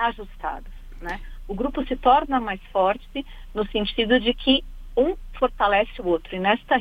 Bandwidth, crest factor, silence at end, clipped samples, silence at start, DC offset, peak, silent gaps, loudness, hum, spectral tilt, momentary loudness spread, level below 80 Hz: 6.6 kHz; 20 dB; 0 s; under 0.1%; 0 s; under 0.1%; -4 dBFS; none; -23 LUFS; none; -6 dB/octave; 14 LU; -38 dBFS